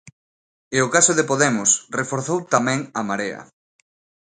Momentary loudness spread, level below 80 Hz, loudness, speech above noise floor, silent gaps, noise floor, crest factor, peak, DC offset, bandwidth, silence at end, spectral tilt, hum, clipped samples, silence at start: 10 LU; -64 dBFS; -19 LUFS; over 70 dB; 0.13-0.71 s; under -90 dBFS; 22 dB; 0 dBFS; under 0.1%; 9.8 kHz; 0.8 s; -3 dB/octave; none; under 0.1%; 0.05 s